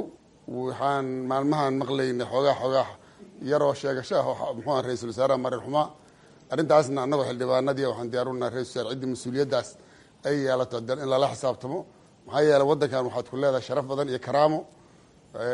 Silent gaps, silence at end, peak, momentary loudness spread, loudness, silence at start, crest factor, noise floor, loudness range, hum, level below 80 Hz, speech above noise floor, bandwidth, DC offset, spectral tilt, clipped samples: none; 0 s; -6 dBFS; 11 LU; -26 LUFS; 0 s; 20 dB; -55 dBFS; 3 LU; none; -66 dBFS; 30 dB; 11.5 kHz; under 0.1%; -6 dB/octave; under 0.1%